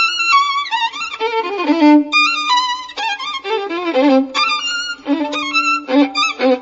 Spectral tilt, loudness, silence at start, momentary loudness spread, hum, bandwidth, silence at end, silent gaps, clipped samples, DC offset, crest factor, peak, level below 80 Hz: -1.5 dB/octave; -15 LUFS; 0 s; 9 LU; none; 8 kHz; 0 s; none; under 0.1%; under 0.1%; 14 dB; -2 dBFS; -62 dBFS